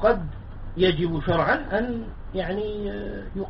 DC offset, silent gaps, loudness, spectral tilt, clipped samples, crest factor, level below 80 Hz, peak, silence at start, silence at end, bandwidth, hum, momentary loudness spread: under 0.1%; none; -26 LUFS; -4.5 dB/octave; under 0.1%; 18 dB; -36 dBFS; -6 dBFS; 0 s; 0 s; 5.8 kHz; none; 12 LU